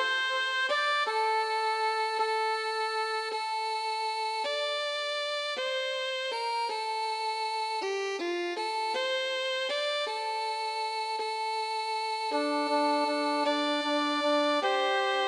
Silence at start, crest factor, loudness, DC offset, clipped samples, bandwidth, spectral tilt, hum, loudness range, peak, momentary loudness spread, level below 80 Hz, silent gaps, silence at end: 0 s; 14 dB; -29 LUFS; under 0.1%; under 0.1%; 13 kHz; 0 dB/octave; none; 3 LU; -16 dBFS; 5 LU; under -90 dBFS; none; 0 s